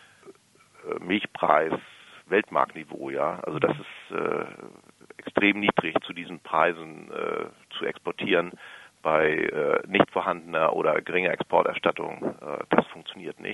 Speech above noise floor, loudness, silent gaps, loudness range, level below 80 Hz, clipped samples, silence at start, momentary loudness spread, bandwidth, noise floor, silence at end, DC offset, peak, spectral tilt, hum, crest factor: 31 dB; -26 LUFS; none; 4 LU; -68 dBFS; under 0.1%; 0.25 s; 14 LU; 11.5 kHz; -57 dBFS; 0 s; under 0.1%; -2 dBFS; -6 dB/octave; none; 24 dB